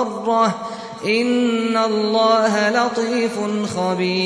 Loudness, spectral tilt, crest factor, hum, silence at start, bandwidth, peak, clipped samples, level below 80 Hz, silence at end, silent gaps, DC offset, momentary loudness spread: -18 LUFS; -4.5 dB/octave; 14 dB; none; 0 s; 11 kHz; -4 dBFS; under 0.1%; -64 dBFS; 0 s; none; under 0.1%; 7 LU